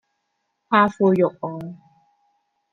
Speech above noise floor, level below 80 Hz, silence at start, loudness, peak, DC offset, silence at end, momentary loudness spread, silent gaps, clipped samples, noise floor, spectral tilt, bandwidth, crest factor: 55 dB; -66 dBFS; 0.7 s; -20 LUFS; -4 dBFS; under 0.1%; 0.95 s; 17 LU; none; under 0.1%; -75 dBFS; -8 dB/octave; 7.6 kHz; 20 dB